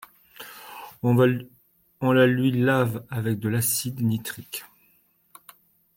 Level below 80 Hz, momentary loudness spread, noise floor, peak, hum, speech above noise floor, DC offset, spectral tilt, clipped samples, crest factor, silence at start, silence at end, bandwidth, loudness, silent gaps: -64 dBFS; 21 LU; -63 dBFS; -8 dBFS; none; 41 dB; under 0.1%; -5.5 dB/octave; under 0.1%; 18 dB; 0.4 s; 1.3 s; 17 kHz; -23 LUFS; none